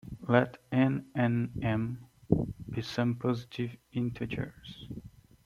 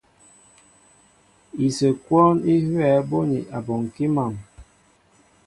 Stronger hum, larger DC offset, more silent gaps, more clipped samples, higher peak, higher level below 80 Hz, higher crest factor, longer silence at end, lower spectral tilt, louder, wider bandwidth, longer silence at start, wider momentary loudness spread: neither; neither; neither; neither; second, -8 dBFS vs -4 dBFS; about the same, -54 dBFS vs -56 dBFS; about the same, 24 dB vs 20 dB; second, 0.35 s vs 0.85 s; about the same, -8 dB/octave vs -7.5 dB/octave; second, -32 LUFS vs -21 LUFS; about the same, 12 kHz vs 11.5 kHz; second, 0.05 s vs 1.55 s; first, 17 LU vs 11 LU